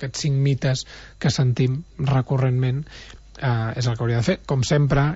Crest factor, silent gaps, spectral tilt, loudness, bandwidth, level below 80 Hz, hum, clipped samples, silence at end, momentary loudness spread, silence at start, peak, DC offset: 14 dB; none; -6 dB/octave; -22 LUFS; 8 kHz; -42 dBFS; none; under 0.1%; 0 s; 9 LU; 0 s; -8 dBFS; under 0.1%